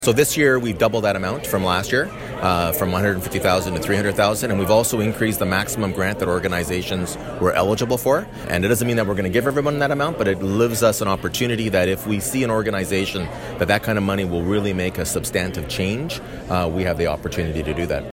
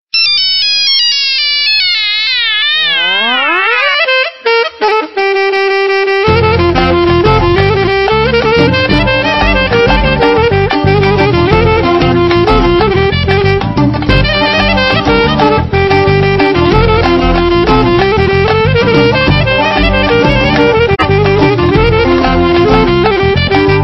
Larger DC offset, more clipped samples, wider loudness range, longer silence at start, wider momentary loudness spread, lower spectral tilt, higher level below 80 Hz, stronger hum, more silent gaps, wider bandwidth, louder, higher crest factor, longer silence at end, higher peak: second, under 0.1% vs 0.2%; neither; about the same, 3 LU vs 1 LU; second, 0 s vs 0.15 s; first, 7 LU vs 2 LU; second, -4.5 dB/octave vs -6 dB/octave; second, -40 dBFS vs -22 dBFS; neither; neither; first, 16.5 kHz vs 6.2 kHz; second, -20 LUFS vs -9 LUFS; first, 16 dB vs 8 dB; about the same, 0.05 s vs 0 s; second, -4 dBFS vs 0 dBFS